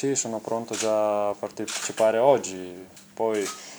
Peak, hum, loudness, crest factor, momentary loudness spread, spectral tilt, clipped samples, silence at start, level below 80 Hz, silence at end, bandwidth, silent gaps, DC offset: -6 dBFS; none; -25 LUFS; 20 dB; 16 LU; -3 dB/octave; under 0.1%; 0 s; -74 dBFS; 0 s; over 20 kHz; none; under 0.1%